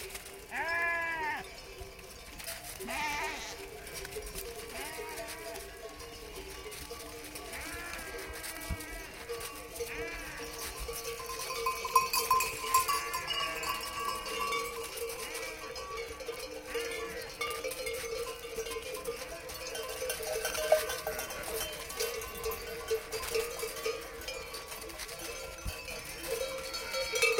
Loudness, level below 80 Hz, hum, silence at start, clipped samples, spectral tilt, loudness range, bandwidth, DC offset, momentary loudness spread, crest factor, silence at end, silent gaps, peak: -36 LUFS; -54 dBFS; none; 0 s; under 0.1%; -1.5 dB/octave; 10 LU; 17 kHz; under 0.1%; 13 LU; 26 dB; 0 s; none; -10 dBFS